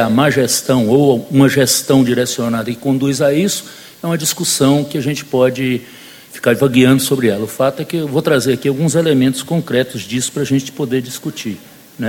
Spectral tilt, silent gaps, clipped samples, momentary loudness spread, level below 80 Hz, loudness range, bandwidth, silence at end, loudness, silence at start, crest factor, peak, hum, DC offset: -5 dB/octave; none; under 0.1%; 10 LU; -52 dBFS; 3 LU; 17 kHz; 0 s; -15 LUFS; 0 s; 14 dB; 0 dBFS; none; under 0.1%